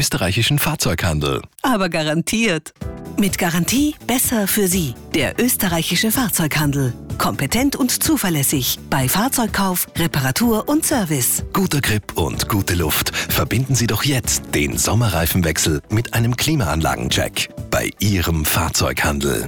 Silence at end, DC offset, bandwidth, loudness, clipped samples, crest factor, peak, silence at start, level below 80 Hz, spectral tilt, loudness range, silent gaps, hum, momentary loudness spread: 0 s; 0.4%; over 20 kHz; -18 LUFS; under 0.1%; 12 dB; -8 dBFS; 0 s; -34 dBFS; -4 dB/octave; 1 LU; none; none; 4 LU